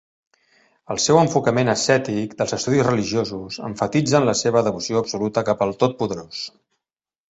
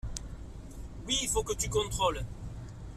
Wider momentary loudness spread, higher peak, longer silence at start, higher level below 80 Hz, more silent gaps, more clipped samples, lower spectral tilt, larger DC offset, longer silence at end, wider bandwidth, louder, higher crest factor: second, 12 LU vs 17 LU; first, 0 dBFS vs -16 dBFS; first, 0.9 s vs 0.05 s; second, -54 dBFS vs -42 dBFS; neither; neither; first, -4.5 dB/octave vs -3 dB/octave; neither; first, 0.8 s vs 0 s; second, 8.2 kHz vs 14.5 kHz; first, -20 LUFS vs -32 LUFS; about the same, 20 dB vs 18 dB